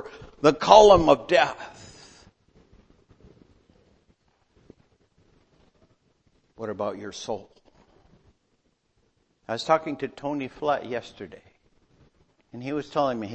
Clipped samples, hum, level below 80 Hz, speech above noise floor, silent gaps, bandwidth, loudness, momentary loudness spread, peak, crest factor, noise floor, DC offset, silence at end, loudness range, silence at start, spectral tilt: under 0.1%; none; -52 dBFS; 48 dB; none; 8.6 kHz; -22 LUFS; 27 LU; 0 dBFS; 26 dB; -70 dBFS; under 0.1%; 0 s; 17 LU; 0.05 s; -4.5 dB/octave